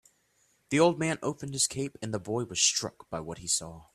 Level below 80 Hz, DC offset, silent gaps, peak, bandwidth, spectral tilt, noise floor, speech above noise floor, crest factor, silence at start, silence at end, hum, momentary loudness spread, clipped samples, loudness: -64 dBFS; under 0.1%; none; -10 dBFS; 14 kHz; -3 dB/octave; -70 dBFS; 40 dB; 22 dB; 0.7 s; 0.1 s; none; 12 LU; under 0.1%; -29 LUFS